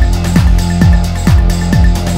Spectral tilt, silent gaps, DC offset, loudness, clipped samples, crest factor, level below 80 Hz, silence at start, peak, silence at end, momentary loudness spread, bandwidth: -6.5 dB/octave; none; under 0.1%; -11 LUFS; 1%; 8 dB; -12 dBFS; 0 s; 0 dBFS; 0 s; 2 LU; 16 kHz